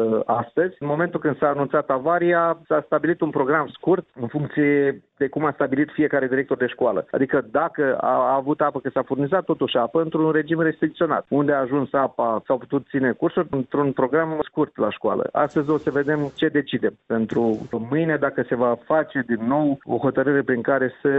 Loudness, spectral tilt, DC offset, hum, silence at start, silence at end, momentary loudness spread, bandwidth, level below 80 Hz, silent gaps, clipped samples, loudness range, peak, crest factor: -22 LUFS; -9 dB/octave; under 0.1%; none; 0 s; 0 s; 4 LU; 4 kHz; -60 dBFS; none; under 0.1%; 1 LU; -6 dBFS; 16 dB